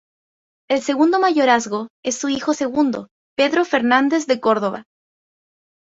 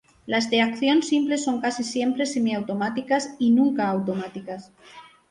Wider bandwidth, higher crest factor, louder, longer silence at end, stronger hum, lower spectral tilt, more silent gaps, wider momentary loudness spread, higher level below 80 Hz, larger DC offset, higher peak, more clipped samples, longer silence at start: second, 8 kHz vs 11 kHz; about the same, 18 dB vs 16 dB; first, -18 LUFS vs -23 LUFS; first, 1.1 s vs 0.3 s; neither; about the same, -3.5 dB/octave vs -4.5 dB/octave; first, 1.90-2.03 s, 3.11-3.36 s vs none; about the same, 10 LU vs 10 LU; about the same, -64 dBFS vs -66 dBFS; neither; first, -2 dBFS vs -8 dBFS; neither; first, 0.7 s vs 0.25 s